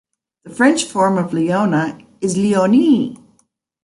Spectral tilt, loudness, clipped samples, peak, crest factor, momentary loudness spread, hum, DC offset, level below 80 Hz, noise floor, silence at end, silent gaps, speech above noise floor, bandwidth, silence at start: -5.5 dB/octave; -16 LUFS; under 0.1%; -2 dBFS; 14 dB; 11 LU; none; under 0.1%; -60 dBFS; -62 dBFS; 0.7 s; none; 47 dB; 11.5 kHz; 0.45 s